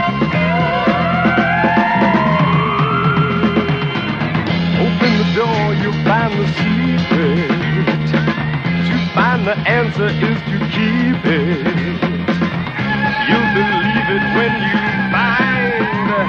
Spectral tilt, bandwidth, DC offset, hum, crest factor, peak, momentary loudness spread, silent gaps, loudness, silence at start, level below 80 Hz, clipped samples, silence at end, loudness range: -7.5 dB/octave; 6.8 kHz; under 0.1%; none; 14 dB; 0 dBFS; 4 LU; none; -15 LUFS; 0 s; -40 dBFS; under 0.1%; 0 s; 2 LU